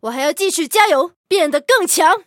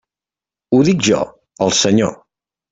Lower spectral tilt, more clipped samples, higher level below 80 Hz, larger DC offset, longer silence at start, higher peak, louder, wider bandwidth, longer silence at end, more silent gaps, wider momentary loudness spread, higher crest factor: second, 0 dB/octave vs -4.5 dB/octave; neither; second, -72 dBFS vs -52 dBFS; neither; second, 0.05 s vs 0.7 s; about the same, 0 dBFS vs -2 dBFS; about the same, -15 LUFS vs -15 LUFS; first, 17.5 kHz vs 8.4 kHz; second, 0.05 s vs 0.55 s; first, 1.16-1.24 s vs none; second, 5 LU vs 8 LU; about the same, 16 dB vs 14 dB